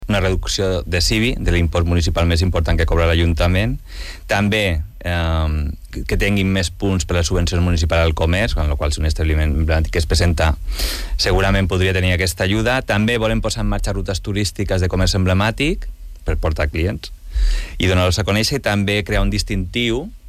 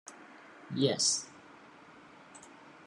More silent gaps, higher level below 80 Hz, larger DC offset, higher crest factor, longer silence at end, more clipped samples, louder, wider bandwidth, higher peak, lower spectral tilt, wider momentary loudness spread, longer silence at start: neither; first, -24 dBFS vs -82 dBFS; neither; second, 14 dB vs 22 dB; second, 0 s vs 0.15 s; neither; first, -18 LUFS vs -30 LUFS; first, 15 kHz vs 12.5 kHz; first, -4 dBFS vs -14 dBFS; first, -5 dB/octave vs -3 dB/octave; second, 7 LU vs 27 LU; about the same, 0 s vs 0.05 s